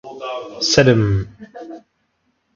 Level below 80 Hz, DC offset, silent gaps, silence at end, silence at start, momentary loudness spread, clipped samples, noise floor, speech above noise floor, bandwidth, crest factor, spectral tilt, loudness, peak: -42 dBFS; under 0.1%; none; 0.75 s; 0.05 s; 24 LU; under 0.1%; -67 dBFS; 50 dB; 7.6 kHz; 20 dB; -5 dB/octave; -17 LUFS; 0 dBFS